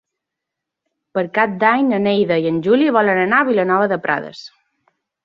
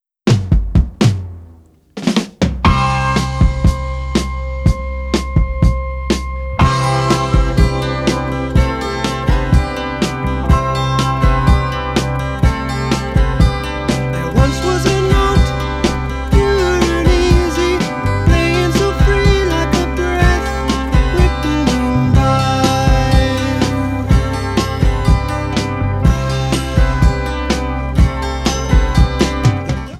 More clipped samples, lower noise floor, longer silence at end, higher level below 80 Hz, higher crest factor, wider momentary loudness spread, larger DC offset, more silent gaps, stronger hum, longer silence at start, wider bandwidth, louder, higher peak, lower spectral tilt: neither; first, -82 dBFS vs -43 dBFS; first, 0.8 s vs 0 s; second, -62 dBFS vs -18 dBFS; about the same, 16 dB vs 14 dB; first, 9 LU vs 6 LU; neither; neither; neither; first, 1.15 s vs 0.25 s; second, 7.2 kHz vs 13.5 kHz; about the same, -16 LUFS vs -15 LUFS; about the same, -2 dBFS vs 0 dBFS; first, -7.5 dB/octave vs -6 dB/octave